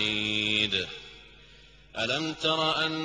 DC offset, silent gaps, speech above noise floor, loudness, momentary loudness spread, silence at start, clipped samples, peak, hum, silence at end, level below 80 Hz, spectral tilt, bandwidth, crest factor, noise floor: under 0.1%; none; 25 dB; -27 LUFS; 16 LU; 0 s; under 0.1%; -12 dBFS; none; 0 s; -58 dBFS; -3.5 dB/octave; 10 kHz; 18 dB; -54 dBFS